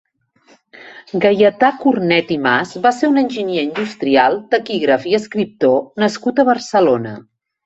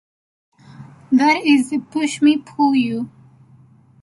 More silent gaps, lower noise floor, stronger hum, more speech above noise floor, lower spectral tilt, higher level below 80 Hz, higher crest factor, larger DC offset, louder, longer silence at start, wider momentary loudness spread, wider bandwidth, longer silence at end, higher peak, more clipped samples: neither; first, -53 dBFS vs -49 dBFS; neither; first, 38 dB vs 33 dB; first, -5.5 dB/octave vs -4 dB/octave; about the same, -60 dBFS vs -64 dBFS; about the same, 16 dB vs 16 dB; neither; about the same, -15 LUFS vs -17 LUFS; about the same, 0.8 s vs 0.8 s; about the same, 7 LU vs 9 LU; second, 8.2 kHz vs 11.5 kHz; second, 0.45 s vs 0.95 s; first, 0 dBFS vs -4 dBFS; neither